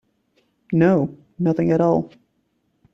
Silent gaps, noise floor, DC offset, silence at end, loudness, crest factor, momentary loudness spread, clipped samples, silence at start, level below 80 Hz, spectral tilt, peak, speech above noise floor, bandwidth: none; -68 dBFS; under 0.1%; 0.85 s; -20 LUFS; 16 dB; 9 LU; under 0.1%; 0.7 s; -58 dBFS; -10 dB/octave; -6 dBFS; 50 dB; 6.4 kHz